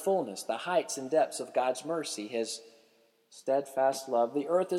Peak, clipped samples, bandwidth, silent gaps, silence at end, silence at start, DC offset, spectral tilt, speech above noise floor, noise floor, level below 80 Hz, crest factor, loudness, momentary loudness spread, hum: -16 dBFS; under 0.1%; 15.5 kHz; none; 0 s; 0 s; under 0.1%; -3.5 dB/octave; 36 dB; -67 dBFS; -90 dBFS; 16 dB; -31 LUFS; 7 LU; none